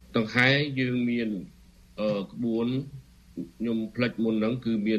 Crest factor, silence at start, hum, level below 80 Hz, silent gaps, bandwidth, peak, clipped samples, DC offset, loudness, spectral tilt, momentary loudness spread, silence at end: 22 dB; 0.1 s; none; -58 dBFS; none; 9 kHz; -6 dBFS; under 0.1%; under 0.1%; -27 LUFS; -7 dB/octave; 18 LU; 0 s